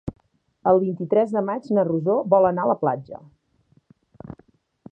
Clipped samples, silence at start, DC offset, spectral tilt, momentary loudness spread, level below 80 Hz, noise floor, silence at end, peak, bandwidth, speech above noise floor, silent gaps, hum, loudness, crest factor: under 0.1%; 0.05 s; under 0.1%; -10 dB/octave; 23 LU; -56 dBFS; -62 dBFS; 0.6 s; -4 dBFS; 5.6 kHz; 41 dB; none; none; -21 LUFS; 20 dB